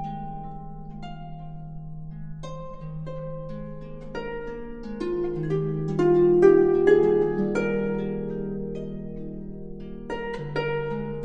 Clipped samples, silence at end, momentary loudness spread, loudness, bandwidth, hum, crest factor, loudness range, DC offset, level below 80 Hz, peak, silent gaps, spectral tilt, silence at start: under 0.1%; 0 s; 21 LU; -24 LUFS; 7.6 kHz; none; 20 dB; 16 LU; under 0.1%; -44 dBFS; -6 dBFS; none; -8.5 dB/octave; 0 s